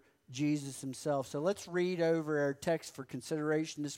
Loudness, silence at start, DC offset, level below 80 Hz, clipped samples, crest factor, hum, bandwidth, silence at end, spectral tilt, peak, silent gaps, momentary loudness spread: -35 LUFS; 0.3 s; under 0.1%; -76 dBFS; under 0.1%; 14 dB; none; 16 kHz; 0 s; -5.5 dB/octave; -20 dBFS; none; 9 LU